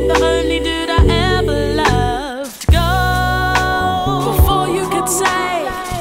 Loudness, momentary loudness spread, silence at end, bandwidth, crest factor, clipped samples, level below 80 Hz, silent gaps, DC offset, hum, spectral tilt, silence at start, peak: -15 LUFS; 6 LU; 0 s; 16.5 kHz; 14 dB; under 0.1%; -22 dBFS; none; under 0.1%; none; -4.5 dB/octave; 0 s; -2 dBFS